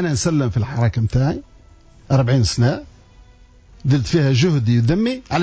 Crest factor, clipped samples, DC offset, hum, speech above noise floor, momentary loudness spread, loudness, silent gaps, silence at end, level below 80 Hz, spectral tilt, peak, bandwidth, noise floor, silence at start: 12 dB; under 0.1%; under 0.1%; none; 30 dB; 5 LU; -18 LUFS; none; 0 s; -36 dBFS; -6.5 dB/octave; -6 dBFS; 8 kHz; -47 dBFS; 0 s